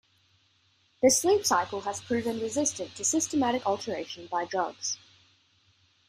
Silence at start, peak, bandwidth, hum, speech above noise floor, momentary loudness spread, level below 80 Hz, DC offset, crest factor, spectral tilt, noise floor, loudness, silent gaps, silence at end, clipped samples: 1 s; -10 dBFS; 15.5 kHz; none; 39 dB; 11 LU; -68 dBFS; under 0.1%; 20 dB; -2.5 dB/octave; -67 dBFS; -28 LUFS; none; 1.15 s; under 0.1%